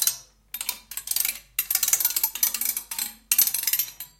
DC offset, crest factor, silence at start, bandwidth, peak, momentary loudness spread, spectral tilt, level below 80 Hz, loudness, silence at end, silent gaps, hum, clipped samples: under 0.1%; 26 dB; 0 s; 17.5 kHz; 0 dBFS; 11 LU; 3 dB/octave; -62 dBFS; -23 LUFS; 0.15 s; none; none; under 0.1%